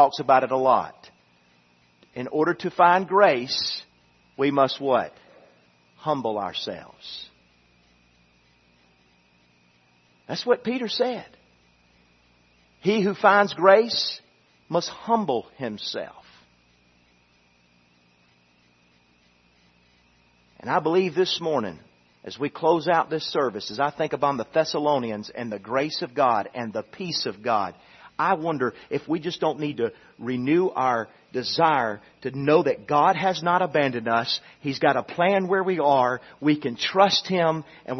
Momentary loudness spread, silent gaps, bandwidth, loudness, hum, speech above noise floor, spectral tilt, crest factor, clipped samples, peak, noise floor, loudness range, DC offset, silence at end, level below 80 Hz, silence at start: 15 LU; none; 6.4 kHz; -23 LUFS; 60 Hz at -60 dBFS; 38 dB; -5 dB/octave; 24 dB; under 0.1%; -2 dBFS; -61 dBFS; 10 LU; under 0.1%; 0 s; -70 dBFS; 0 s